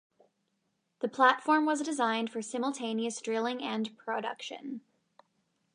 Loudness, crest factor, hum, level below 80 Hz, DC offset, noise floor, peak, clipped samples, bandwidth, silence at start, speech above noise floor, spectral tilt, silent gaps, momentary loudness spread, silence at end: -31 LUFS; 24 dB; none; -88 dBFS; under 0.1%; -79 dBFS; -8 dBFS; under 0.1%; 11 kHz; 1 s; 48 dB; -3 dB/octave; none; 15 LU; 0.95 s